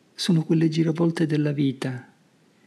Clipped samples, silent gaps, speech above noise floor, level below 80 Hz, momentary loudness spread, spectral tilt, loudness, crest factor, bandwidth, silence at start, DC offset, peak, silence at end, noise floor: under 0.1%; none; 37 dB; -74 dBFS; 11 LU; -7 dB/octave; -23 LUFS; 14 dB; 12.5 kHz; 0.2 s; under 0.1%; -10 dBFS; 0.65 s; -60 dBFS